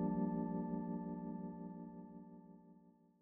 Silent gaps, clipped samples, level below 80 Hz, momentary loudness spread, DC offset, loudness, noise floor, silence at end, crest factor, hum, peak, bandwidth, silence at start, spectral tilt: none; under 0.1%; -70 dBFS; 21 LU; under 0.1%; -44 LUFS; -67 dBFS; 0.3 s; 16 dB; none; -28 dBFS; 2.3 kHz; 0 s; -8.5 dB/octave